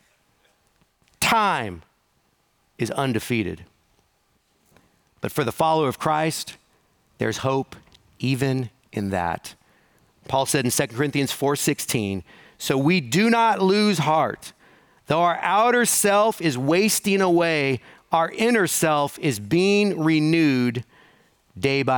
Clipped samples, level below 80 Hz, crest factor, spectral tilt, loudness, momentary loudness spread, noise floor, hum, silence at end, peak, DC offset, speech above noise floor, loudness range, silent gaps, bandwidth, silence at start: under 0.1%; -60 dBFS; 18 dB; -4.5 dB/octave; -21 LUFS; 12 LU; -66 dBFS; none; 0 s; -6 dBFS; under 0.1%; 45 dB; 7 LU; none; over 20 kHz; 1.2 s